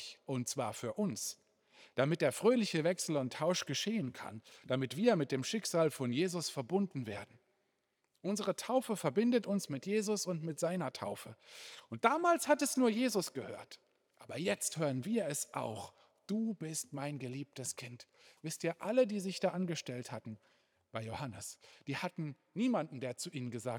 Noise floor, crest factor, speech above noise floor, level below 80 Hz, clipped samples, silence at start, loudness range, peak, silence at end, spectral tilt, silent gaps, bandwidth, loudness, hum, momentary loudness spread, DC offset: -82 dBFS; 24 dB; 45 dB; -86 dBFS; under 0.1%; 0 s; 6 LU; -12 dBFS; 0 s; -4.5 dB/octave; none; over 20 kHz; -36 LUFS; none; 16 LU; under 0.1%